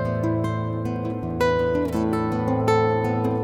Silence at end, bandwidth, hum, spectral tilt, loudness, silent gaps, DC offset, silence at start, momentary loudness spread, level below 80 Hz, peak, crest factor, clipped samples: 0 s; 15.5 kHz; none; -7.5 dB/octave; -23 LUFS; none; under 0.1%; 0 s; 7 LU; -44 dBFS; -6 dBFS; 16 dB; under 0.1%